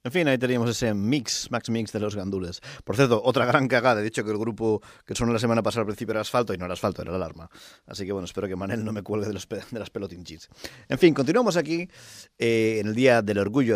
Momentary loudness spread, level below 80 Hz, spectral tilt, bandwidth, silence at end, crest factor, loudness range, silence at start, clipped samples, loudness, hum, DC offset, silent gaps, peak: 15 LU; -54 dBFS; -5.5 dB/octave; 15.5 kHz; 0 s; 20 dB; 8 LU; 0.05 s; under 0.1%; -25 LUFS; none; under 0.1%; none; -4 dBFS